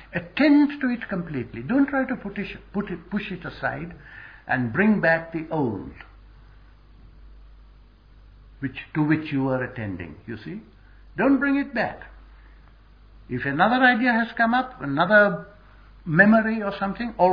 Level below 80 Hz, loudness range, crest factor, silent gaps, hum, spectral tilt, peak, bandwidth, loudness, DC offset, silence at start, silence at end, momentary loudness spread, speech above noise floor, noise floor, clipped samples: -50 dBFS; 9 LU; 22 dB; none; none; -9 dB/octave; -2 dBFS; 5.2 kHz; -23 LUFS; under 0.1%; 0 s; 0 s; 18 LU; 28 dB; -51 dBFS; under 0.1%